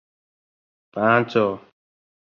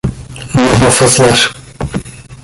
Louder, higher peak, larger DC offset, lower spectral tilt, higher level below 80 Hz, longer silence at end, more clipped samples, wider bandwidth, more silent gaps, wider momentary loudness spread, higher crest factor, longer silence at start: second, -20 LUFS vs -10 LUFS; second, -4 dBFS vs 0 dBFS; neither; first, -7.5 dB/octave vs -4 dB/octave; second, -64 dBFS vs -30 dBFS; first, 0.75 s vs 0.1 s; neither; second, 7 kHz vs 12 kHz; neither; about the same, 18 LU vs 16 LU; first, 22 dB vs 12 dB; first, 0.95 s vs 0.05 s